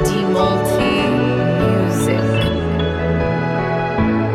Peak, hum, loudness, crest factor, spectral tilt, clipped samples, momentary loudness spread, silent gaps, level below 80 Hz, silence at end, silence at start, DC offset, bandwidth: -4 dBFS; none; -17 LUFS; 12 dB; -6.5 dB/octave; under 0.1%; 3 LU; none; -34 dBFS; 0 s; 0 s; under 0.1%; 16 kHz